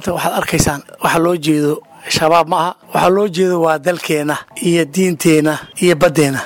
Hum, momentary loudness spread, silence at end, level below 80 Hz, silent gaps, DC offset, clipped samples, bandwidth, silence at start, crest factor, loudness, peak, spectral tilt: none; 6 LU; 0 s; -42 dBFS; none; under 0.1%; under 0.1%; 18 kHz; 0 s; 12 dB; -15 LUFS; -2 dBFS; -4.5 dB/octave